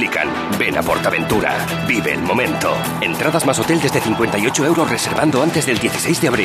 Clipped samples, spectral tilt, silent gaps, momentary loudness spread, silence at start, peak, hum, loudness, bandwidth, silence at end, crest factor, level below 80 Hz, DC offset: under 0.1%; -4 dB/octave; none; 3 LU; 0 s; 0 dBFS; none; -17 LUFS; 15 kHz; 0 s; 16 dB; -44 dBFS; under 0.1%